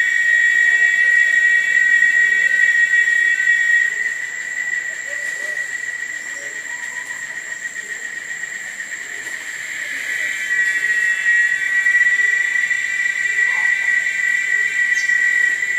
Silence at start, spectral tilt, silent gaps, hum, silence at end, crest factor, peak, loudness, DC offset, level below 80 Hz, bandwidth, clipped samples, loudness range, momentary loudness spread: 0 s; 1.5 dB/octave; none; none; 0 s; 14 dB; -4 dBFS; -15 LUFS; under 0.1%; -76 dBFS; 15.5 kHz; under 0.1%; 13 LU; 14 LU